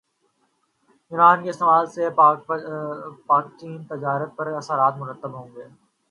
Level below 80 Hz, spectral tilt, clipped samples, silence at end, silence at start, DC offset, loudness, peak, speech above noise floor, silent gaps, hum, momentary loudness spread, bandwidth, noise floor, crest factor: -76 dBFS; -6.5 dB/octave; under 0.1%; 0.45 s; 1.1 s; under 0.1%; -20 LUFS; -2 dBFS; 47 dB; none; none; 19 LU; 11 kHz; -69 dBFS; 20 dB